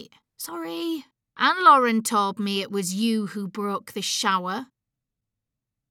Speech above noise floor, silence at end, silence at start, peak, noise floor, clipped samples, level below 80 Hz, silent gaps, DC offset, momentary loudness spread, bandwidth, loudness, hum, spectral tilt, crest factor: 61 dB; 1.25 s; 0 s; -2 dBFS; -85 dBFS; under 0.1%; -82 dBFS; none; under 0.1%; 17 LU; 18 kHz; -23 LUFS; none; -3.5 dB/octave; 22 dB